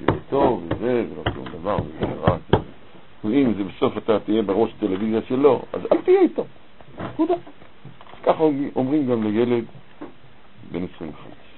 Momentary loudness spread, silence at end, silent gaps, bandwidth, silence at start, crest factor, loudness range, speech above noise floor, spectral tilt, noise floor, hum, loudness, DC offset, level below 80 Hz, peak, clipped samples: 17 LU; 0.25 s; none; 4.3 kHz; 0 s; 22 dB; 3 LU; 30 dB; -11.5 dB/octave; -50 dBFS; none; -22 LUFS; 0.9%; -46 dBFS; 0 dBFS; under 0.1%